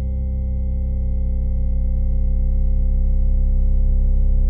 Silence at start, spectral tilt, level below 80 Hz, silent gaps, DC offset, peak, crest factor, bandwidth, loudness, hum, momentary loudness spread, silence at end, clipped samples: 0 s; -13 dB/octave; -16 dBFS; none; 0.2%; -8 dBFS; 8 dB; 0.8 kHz; -22 LUFS; none; 3 LU; 0 s; under 0.1%